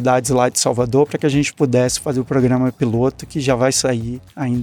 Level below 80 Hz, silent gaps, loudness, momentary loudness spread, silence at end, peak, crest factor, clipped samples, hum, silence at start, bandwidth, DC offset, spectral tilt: -44 dBFS; none; -17 LUFS; 7 LU; 0 s; -2 dBFS; 14 dB; under 0.1%; none; 0 s; 17.5 kHz; under 0.1%; -5 dB/octave